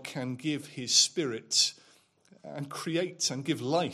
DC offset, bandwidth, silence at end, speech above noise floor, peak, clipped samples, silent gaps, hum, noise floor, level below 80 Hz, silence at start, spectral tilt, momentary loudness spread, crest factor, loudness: under 0.1%; 15.5 kHz; 0 s; 32 dB; -10 dBFS; under 0.1%; none; none; -63 dBFS; -78 dBFS; 0 s; -2.5 dB/octave; 14 LU; 22 dB; -28 LUFS